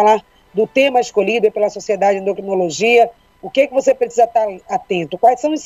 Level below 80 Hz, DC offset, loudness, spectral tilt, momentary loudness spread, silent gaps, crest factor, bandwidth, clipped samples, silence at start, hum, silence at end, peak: -58 dBFS; under 0.1%; -16 LUFS; -4 dB/octave; 7 LU; none; 14 dB; 15 kHz; under 0.1%; 0 s; none; 0 s; 0 dBFS